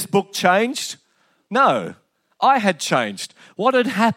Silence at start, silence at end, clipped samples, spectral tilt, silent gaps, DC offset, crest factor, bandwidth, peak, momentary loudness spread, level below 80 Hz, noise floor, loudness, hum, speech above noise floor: 0 s; 0.05 s; under 0.1%; -4 dB/octave; none; under 0.1%; 18 dB; 16.5 kHz; -2 dBFS; 15 LU; -76 dBFS; -63 dBFS; -19 LUFS; none; 44 dB